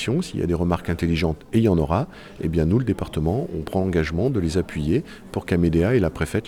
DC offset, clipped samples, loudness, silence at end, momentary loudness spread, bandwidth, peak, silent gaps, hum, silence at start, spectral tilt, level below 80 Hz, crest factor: under 0.1%; under 0.1%; -23 LUFS; 0 s; 6 LU; 15 kHz; -6 dBFS; none; none; 0 s; -7.5 dB/octave; -40 dBFS; 16 dB